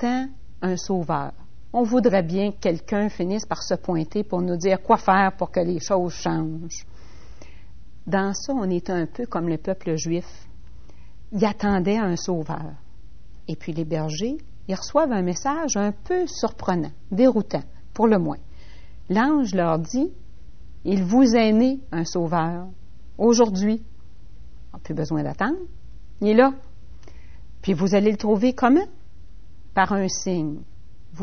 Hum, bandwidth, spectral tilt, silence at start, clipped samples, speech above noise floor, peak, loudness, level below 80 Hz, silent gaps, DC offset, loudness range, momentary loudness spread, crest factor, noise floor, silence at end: none; 6.6 kHz; -6 dB/octave; 0 s; under 0.1%; 25 dB; -2 dBFS; -23 LUFS; -46 dBFS; none; 2%; 6 LU; 13 LU; 20 dB; -47 dBFS; 0 s